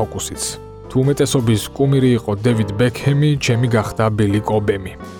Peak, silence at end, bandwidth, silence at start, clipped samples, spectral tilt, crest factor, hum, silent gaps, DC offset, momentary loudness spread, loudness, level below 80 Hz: -4 dBFS; 0 s; 18 kHz; 0 s; under 0.1%; -6 dB/octave; 14 dB; none; none; under 0.1%; 7 LU; -17 LUFS; -40 dBFS